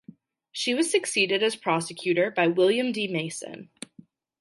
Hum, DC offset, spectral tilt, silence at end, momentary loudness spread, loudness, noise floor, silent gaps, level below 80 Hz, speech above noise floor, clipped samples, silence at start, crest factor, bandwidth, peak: none; under 0.1%; -3.5 dB/octave; 0.75 s; 19 LU; -25 LUFS; -55 dBFS; none; -78 dBFS; 29 dB; under 0.1%; 0.55 s; 18 dB; 11.5 kHz; -10 dBFS